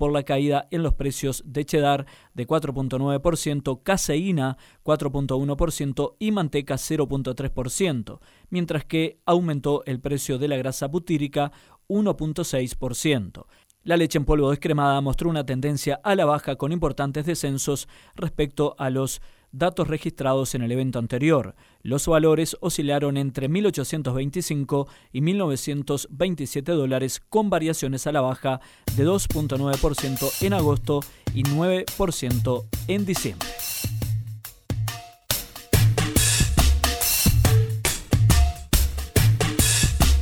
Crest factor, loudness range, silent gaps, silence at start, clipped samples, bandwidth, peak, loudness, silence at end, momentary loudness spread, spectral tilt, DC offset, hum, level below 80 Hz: 18 dB; 6 LU; none; 0 s; under 0.1%; 19 kHz; -4 dBFS; -24 LUFS; 0 s; 9 LU; -5 dB/octave; under 0.1%; none; -32 dBFS